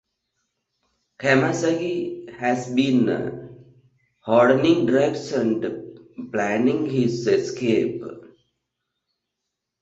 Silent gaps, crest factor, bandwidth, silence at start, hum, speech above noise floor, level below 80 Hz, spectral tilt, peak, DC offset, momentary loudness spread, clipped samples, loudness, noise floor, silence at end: none; 20 dB; 8 kHz; 1.2 s; none; 61 dB; -62 dBFS; -6 dB/octave; -4 dBFS; under 0.1%; 15 LU; under 0.1%; -21 LUFS; -82 dBFS; 1.55 s